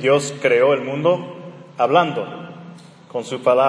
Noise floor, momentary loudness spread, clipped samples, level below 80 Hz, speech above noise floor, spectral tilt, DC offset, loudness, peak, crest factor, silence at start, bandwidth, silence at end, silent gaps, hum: -41 dBFS; 20 LU; under 0.1%; -70 dBFS; 23 dB; -5 dB/octave; under 0.1%; -19 LUFS; -2 dBFS; 18 dB; 0 s; 10.5 kHz; 0 s; none; none